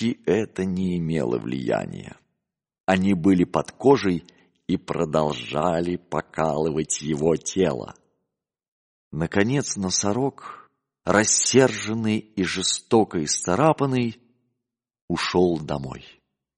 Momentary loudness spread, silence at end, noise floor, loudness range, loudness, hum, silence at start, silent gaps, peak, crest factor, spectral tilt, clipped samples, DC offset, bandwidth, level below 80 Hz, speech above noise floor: 12 LU; 0.5 s; -84 dBFS; 5 LU; -23 LUFS; none; 0 s; 2.80-2.84 s, 8.68-9.11 s, 15.02-15.08 s; -4 dBFS; 20 dB; -4.5 dB/octave; under 0.1%; under 0.1%; 10.5 kHz; -54 dBFS; 62 dB